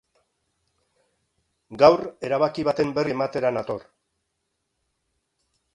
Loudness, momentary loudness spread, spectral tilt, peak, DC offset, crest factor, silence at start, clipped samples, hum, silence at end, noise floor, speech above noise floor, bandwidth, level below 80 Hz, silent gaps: -22 LUFS; 15 LU; -6.5 dB/octave; 0 dBFS; under 0.1%; 24 dB; 1.7 s; under 0.1%; none; 1.95 s; -77 dBFS; 55 dB; 10.5 kHz; -62 dBFS; none